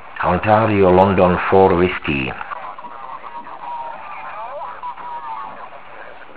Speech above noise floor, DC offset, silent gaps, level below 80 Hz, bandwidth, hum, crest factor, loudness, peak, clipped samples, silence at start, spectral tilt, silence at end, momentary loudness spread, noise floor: 24 dB; 1%; none; -40 dBFS; 4 kHz; none; 18 dB; -15 LUFS; 0 dBFS; under 0.1%; 0 s; -11 dB/octave; 0.05 s; 20 LU; -38 dBFS